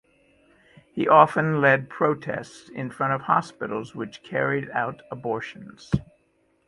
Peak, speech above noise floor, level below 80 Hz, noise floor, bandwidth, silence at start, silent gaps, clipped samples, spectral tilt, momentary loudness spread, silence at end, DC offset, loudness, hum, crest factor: -2 dBFS; 43 dB; -52 dBFS; -66 dBFS; 11.5 kHz; 0.95 s; none; under 0.1%; -7 dB/octave; 17 LU; 0.65 s; under 0.1%; -24 LUFS; none; 24 dB